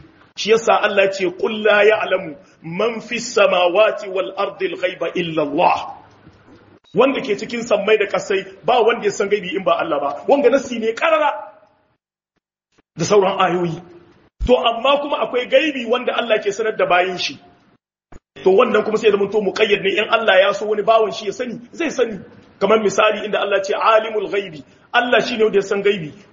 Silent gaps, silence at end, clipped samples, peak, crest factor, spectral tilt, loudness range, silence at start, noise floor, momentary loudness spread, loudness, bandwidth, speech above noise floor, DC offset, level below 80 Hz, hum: none; 0.15 s; under 0.1%; 0 dBFS; 18 dB; -2 dB/octave; 3 LU; 0.35 s; -75 dBFS; 10 LU; -17 LUFS; 7.4 kHz; 58 dB; under 0.1%; -46 dBFS; none